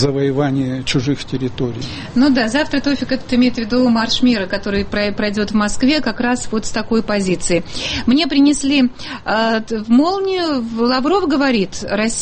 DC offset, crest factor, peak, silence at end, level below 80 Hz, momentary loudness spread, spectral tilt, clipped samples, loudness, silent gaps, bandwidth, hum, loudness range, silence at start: under 0.1%; 14 dB; -2 dBFS; 0 s; -38 dBFS; 7 LU; -4.5 dB/octave; under 0.1%; -17 LUFS; none; 8.8 kHz; none; 2 LU; 0 s